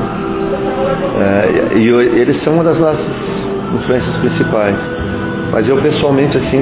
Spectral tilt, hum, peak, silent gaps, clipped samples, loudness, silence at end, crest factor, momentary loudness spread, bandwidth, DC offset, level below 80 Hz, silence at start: -11 dB/octave; none; 0 dBFS; none; under 0.1%; -13 LUFS; 0 s; 12 dB; 8 LU; 4 kHz; under 0.1%; -34 dBFS; 0 s